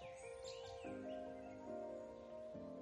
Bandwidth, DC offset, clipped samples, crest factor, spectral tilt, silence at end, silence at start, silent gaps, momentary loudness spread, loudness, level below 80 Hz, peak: 11.5 kHz; under 0.1%; under 0.1%; 14 dB; -5 dB/octave; 0 s; 0 s; none; 4 LU; -52 LUFS; -74 dBFS; -38 dBFS